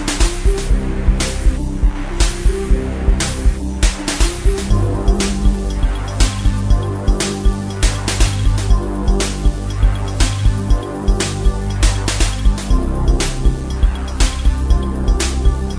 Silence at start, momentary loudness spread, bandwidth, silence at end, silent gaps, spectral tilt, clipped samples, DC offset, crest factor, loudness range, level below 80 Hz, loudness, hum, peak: 0 s; 3 LU; 11 kHz; 0 s; none; -4.5 dB/octave; under 0.1%; under 0.1%; 14 dB; 1 LU; -16 dBFS; -18 LUFS; none; 0 dBFS